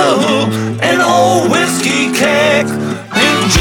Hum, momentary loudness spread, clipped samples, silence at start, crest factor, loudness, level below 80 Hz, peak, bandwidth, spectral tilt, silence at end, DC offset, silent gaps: none; 6 LU; under 0.1%; 0 s; 12 dB; -11 LUFS; -54 dBFS; 0 dBFS; 18.5 kHz; -4 dB/octave; 0 s; under 0.1%; none